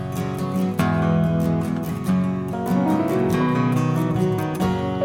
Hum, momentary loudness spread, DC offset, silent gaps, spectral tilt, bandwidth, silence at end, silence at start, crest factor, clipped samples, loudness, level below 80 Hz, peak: none; 5 LU; under 0.1%; none; -7.5 dB/octave; 17 kHz; 0 s; 0 s; 16 dB; under 0.1%; -22 LUFS; -46 dBFS; -6 dBFS